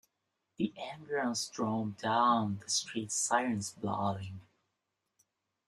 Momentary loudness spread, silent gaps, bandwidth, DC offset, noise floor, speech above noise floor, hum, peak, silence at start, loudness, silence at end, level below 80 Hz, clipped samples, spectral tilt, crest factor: 9 LU; none; 13 kHz; under 0.1%; -85 dBFS; 51 dB; none; -14 dBFS; 0.6 s; -33 LUFS; 1.25 s; -74 dBFS; under 0.1%; -3.5 dB/octave; 22 dB